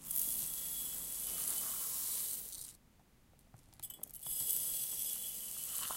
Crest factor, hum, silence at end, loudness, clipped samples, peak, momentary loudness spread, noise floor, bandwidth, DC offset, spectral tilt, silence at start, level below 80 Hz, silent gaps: 26 dB; none; 0 s; -37 LUFS; under 0.1%; -16 dBFS; 12 LU; -67 dBFS; 17 kHz; under 0.1%; 0.5 dB/octave; 0 s; -68 dBFS; none